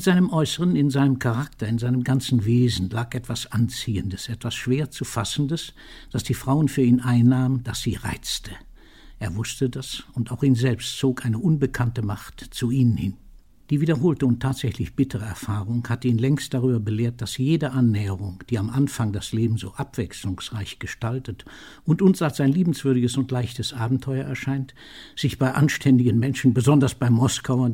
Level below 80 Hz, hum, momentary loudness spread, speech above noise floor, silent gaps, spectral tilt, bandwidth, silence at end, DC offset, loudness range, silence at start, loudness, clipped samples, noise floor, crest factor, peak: -46 dBFS; none; 11 LU; 24 dB; none; -6.5 dB/octave; 16.5 kHz; 0 s; 0.2%; 4 LU; 0 s; -23 LUFS; under 0.1%; -46 dBFS; 16 dB; -6 dBFS